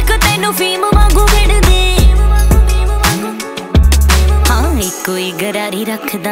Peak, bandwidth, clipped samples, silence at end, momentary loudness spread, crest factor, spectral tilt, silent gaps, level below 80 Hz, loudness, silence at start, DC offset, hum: 0 dBFS; 16.5 kHz; under 0.1%; 0 s; 8 LU; 10 dB; -4.5 dB/octave; none; -12 dBFS; -12 LUFS; 0 s; under 0.1%; none